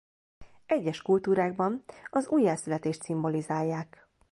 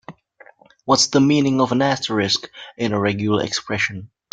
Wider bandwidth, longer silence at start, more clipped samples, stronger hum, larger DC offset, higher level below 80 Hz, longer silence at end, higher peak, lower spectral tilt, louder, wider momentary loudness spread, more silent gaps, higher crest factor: first, 11.5 kHz vs 9.4 kHz; first, 0.4 s vs 0.1 s; neither; neither; neither; second, -66 dBFS vs -58 dBFS; first, 0.45 s vs 0.25 s; second, -14 dBFS vs -2 dBFS; first, -6.5 dB/octave vs -4 dB/octave; second, -29 LUFS vs -19 LUFS; second, 7 LU vs 10 LU; neither; about the same, 16 dB vs 20 dB